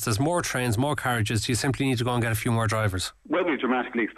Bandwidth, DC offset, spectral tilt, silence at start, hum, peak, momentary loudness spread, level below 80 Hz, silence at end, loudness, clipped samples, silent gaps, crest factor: 14.5 kHz; under 0.1%; -5 dB/octave; 0 s; none; -12 dBFS; 2 LU; -52 dBFS; 0.05 s; -25 LUFS; under 0.1%; none; 12 dB